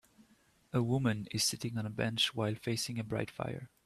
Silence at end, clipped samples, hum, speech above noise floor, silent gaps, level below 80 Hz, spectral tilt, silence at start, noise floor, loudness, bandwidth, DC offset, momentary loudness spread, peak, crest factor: 0.2 s; under 0.1%; none; 33 dB; none; -66 dBFS; -4 dB/octave; 0.75 s; -68 dBFS; -34 LUFS; 14 kHz; under 0.1%; 7 LU; -18 dBFS; 18 dB